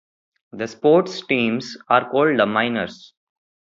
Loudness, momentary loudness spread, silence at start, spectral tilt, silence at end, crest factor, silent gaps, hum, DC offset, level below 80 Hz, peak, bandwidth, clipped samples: -19 LUFS; 12 LU; 0.55 s; -5.5 dB/octave; 0.75 s; 20 dB; none; none; under 0.1%; -64 dBFS; -2 dBFS; 7.6 kHz; under 0.1%